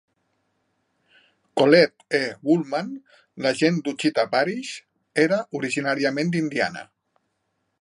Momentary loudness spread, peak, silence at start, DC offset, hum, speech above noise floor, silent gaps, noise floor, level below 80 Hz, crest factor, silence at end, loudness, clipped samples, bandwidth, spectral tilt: 14 LU; -2 dBFS; 1.55 s; under 0.1%; none; 52 dB; none; -74 dBFS; -72 dBFS; 22 dB; 0.95 s; -22 LUFS; under 0.1%; 11 kHz; -5.5 dB/octave